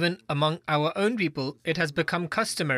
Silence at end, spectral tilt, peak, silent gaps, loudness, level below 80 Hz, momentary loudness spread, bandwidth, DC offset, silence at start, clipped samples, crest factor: 0 s; -5 dB/octave; -12 dBFS; none; -27 LUFS; -64 dBFS; 3 LU; 14 kHz; under 0.1%; 0 s; under 0.1%; 14 dB